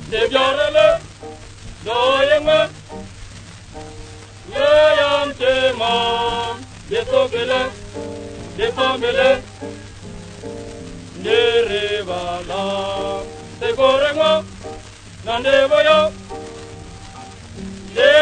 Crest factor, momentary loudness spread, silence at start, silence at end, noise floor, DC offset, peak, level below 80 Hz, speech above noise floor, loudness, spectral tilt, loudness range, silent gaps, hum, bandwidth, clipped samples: 18 dB; 22 LU; 0 s; 0 s; -37 dBFS; under 0.1%; 0 dBFS; -42 dBFS; 21 dB; -17 LUFS; -3.5 dB/octave; 4 LU; none; none; 9.6 kHz; under 0.1%